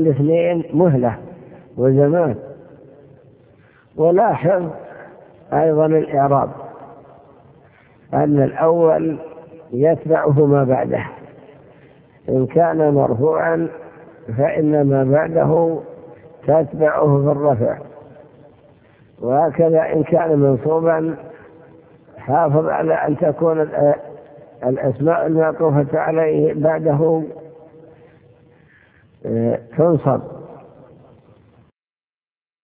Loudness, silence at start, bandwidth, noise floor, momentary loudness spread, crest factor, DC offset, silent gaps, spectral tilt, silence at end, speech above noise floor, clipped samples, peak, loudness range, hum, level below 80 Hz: -17 LUFS; 0 s; 3.4 kHz; under -90 dBFS; 16 LU; 16 dB; under 0.1%; none; -13 dB/octave; 2.05 s; over 74 dB; under 0.1%; -2 dBFS; 5 LU; none; -54 dBFS